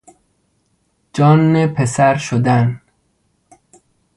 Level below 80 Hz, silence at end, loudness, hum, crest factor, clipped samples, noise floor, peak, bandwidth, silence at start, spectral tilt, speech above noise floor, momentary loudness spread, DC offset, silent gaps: -52 dBFS; 1.4 s; -14 LUFS; none; 16 dB; under 0.1%; -63 dBFS; 0 dBFS; 11.5 kHz; 1.15 s; -7 dB/octave; 50 dB; 10 LU; under 0.1%; none